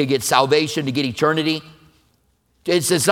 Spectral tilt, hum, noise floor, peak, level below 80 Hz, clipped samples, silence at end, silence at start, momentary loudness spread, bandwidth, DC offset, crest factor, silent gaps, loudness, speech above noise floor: -4 dB/octave; none; -63 dBFS; 0 dBFS; -60 dBFS; under 0.1%; 0 s; 0 s; 7 LU; 18.5 kHz; under 0.1%; 20 dB; none; -19 LUFS; 45 dB